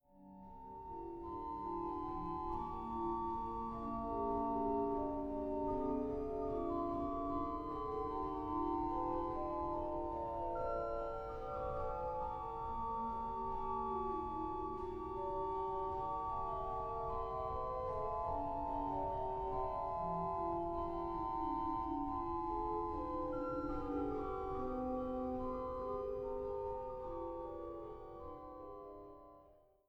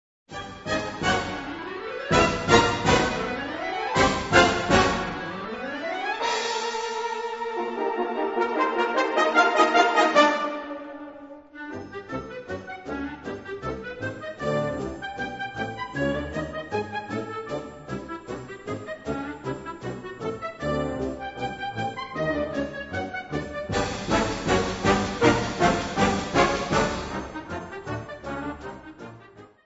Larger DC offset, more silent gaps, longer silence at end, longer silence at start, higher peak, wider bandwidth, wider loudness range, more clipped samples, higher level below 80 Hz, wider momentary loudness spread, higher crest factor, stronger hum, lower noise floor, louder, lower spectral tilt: neither; neither; first, 0.35 s vs 0.2 s; second, 0.15 s vs 0.3 s; second, -26 dBFS vs -2 dBFS; second, 7.2 kHz vs 8 kHz; second, 3 LU vs 11 LU; neither; second, -54 dBFS vs -46 dBFS; second, 8 LU vs 16 LU; second, 14 dB vs 24 dB; neither; first, -66 dBFS vs -49 dBFS; second, -41 LUFS vs -26 LUFS; first, -9.5 dB/octave vs -4.5 dB/octave